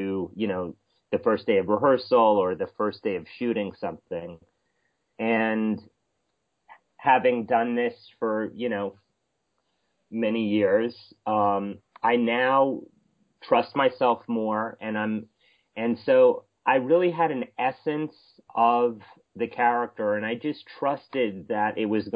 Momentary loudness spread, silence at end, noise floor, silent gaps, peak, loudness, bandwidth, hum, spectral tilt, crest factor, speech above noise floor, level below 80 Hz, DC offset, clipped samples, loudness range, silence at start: 12 LU; 0 s; -77 dBFS; none; -8 dBFS; -25 LUFS; 5.2 kHz; none; -9 dB/octave; 18 dB; 52 dB; -66 dBFS; under 0.1%; under 0.1%; 5 LU; 0 s